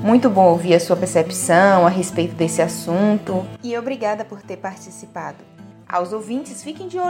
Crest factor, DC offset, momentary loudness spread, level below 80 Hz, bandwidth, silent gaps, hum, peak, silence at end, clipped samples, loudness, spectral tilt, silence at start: 18 dB; under 0.1%; 18 LU; -60 dBFS; 16.5 kHz; none; none; 0 dBFS; 0 s; under 0.1%; -18 LUFS; -5.5 dB/octave; 0 s